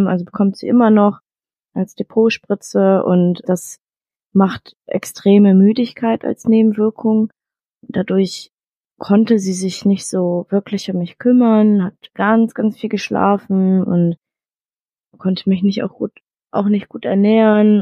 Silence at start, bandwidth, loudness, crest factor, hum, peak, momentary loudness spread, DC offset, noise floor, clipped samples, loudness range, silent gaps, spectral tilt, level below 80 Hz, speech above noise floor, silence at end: 0 s; 12.5 kHz; -16 LUFS; 14 dB; none; -2 dBFS; 13 LU; under 0.1%; under -90 dBFS; under 0.1%; 4 LU; 4.76-4.80 s, 7.75-7.81 s, 8.53-8.57 s, 8.76-8.81 s, 14.81-14.85 s; -7 dB/octave; -62 dBFS; over 75 dB; 0 s